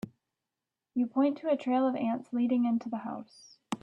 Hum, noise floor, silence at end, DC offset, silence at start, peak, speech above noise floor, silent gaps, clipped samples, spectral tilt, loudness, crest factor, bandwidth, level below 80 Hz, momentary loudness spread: none; -89 dBFS; 0.05 s; under 0.1%; 0.05 s; -16 dBFS; 59 dB; none; under 0.1%; -6.5 dB/octave; -31 LUFS; 14 dB; 9.4 kHz; -76 dBFS; 13 LU